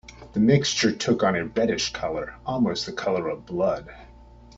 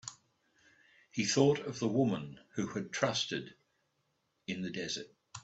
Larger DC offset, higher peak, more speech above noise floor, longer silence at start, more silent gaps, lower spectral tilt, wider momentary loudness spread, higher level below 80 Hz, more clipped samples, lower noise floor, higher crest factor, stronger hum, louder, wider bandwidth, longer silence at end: neither; first, -6 dBFS vs -14 dBFS; second, 24 dB vs 46 dB; about the same, 0.1 s vs 0.05 s; neither; about the same, -5 dB/octave vs -4.5 dB/octave; second, 11 LU vs 16 LU; first, -50 dBFS vs -72 dBFS; neither; second, -48 dBFS vs -79 dBFS; about the same, 20 dB vs 22 dB; neither; first, -24 LUFS vs -34 LUFS; about the same, 8 kHz vs 8.2 kHz; first, 0.35 s vs 0.05 s